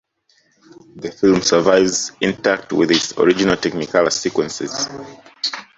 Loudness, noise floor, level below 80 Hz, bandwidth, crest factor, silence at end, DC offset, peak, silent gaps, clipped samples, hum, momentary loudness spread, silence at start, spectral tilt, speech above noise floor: -17 LUFS; -60 dBFS; -52 dBFS; 8.2 kHz; 18 dB; 0.15 s; under 0.1%; -2 dBFS; none; under 0.1%; none; 11 LU; 0.95 s; -3.5 dB/octave; 43 dB